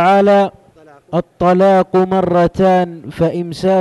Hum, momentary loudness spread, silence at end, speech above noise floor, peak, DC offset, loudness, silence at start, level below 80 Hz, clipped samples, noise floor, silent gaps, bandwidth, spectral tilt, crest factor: none; 11 LU; 0 s; 32 dB; -4 dBFS; under 0.1%; -14 LUFS; 0 s; -44 dBFS; under 0.1%; -44 dBFS; none; 12 kHz; -7.5 dB/octave; 10 dB